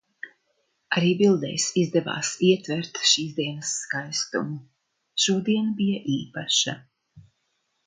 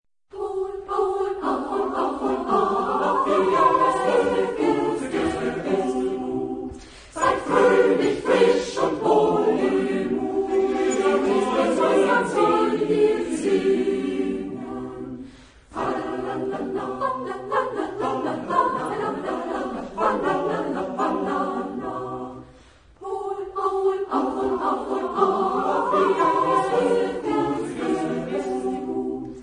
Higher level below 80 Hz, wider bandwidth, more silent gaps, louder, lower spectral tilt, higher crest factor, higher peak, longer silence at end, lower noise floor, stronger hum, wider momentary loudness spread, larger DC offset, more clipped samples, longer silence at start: second, -70 dBFS vs -54 dBFS; about the same, 9.6 kHz vs 10.5 kHz; neither; about the same, -24 LUFS vs -23 LUFS; second, -3.5 dB/octave vs -5.5 dB/octave; about the same, 22 dB vs 18 dB; about the same, -4 dBFS vs -4 dBFS; first, 0.65 s vs 0 s; first, -74 dBFS vs -51 dBFS; neither; about the same, 11 LU vs 11 LU; neither; neither; about the same, 0.25 s vs 0.35 s